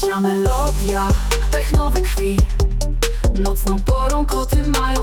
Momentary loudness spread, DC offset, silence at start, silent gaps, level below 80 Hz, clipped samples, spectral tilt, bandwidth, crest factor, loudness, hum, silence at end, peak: 2 LU; under 0.1%; 0 s; none; -18 dBFS; under 0.1%; -5.5 dB/octave; 18 kHz; 12 dB; -19 LUFS; none; 0 s; -4 dBFS